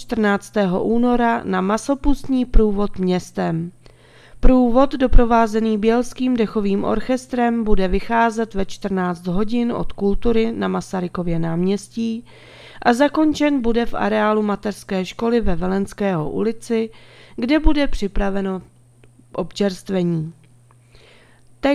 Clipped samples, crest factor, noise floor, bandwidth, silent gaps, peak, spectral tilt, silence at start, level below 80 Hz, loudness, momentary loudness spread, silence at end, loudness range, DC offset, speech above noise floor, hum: under 0.1%; 18 dB; -50 dBFS; 12 kHz; none; 0 dBFS; -6.5 dB/octave; 0 s; -28 dBFS; -20 LUFS; 8 LU; 0 s; 4 LU; under 0.1%; 33 dB; none